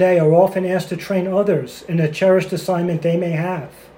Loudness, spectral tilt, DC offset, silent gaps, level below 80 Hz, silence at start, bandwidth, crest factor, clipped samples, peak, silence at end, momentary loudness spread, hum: -18 LUFS; -7.5 dB/octave; under 0.1%; none; -58 dBFS; 0 s; 16.5 kHz; 16 dB; under 0.1%; 0 dBFS; 0.3 s; 9 LU; none